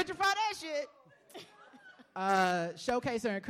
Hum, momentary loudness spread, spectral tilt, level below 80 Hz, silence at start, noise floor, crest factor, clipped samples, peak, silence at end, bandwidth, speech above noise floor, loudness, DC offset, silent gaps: none; 22 LU; -4 dB/octave; -68 dBFS; 0 s; -57 dBFS; 20 dB; under 0.1%; -14 dBFS; 0 s; 16.5 kHz; 25 dB; -32 LUFS; under 0.1%; none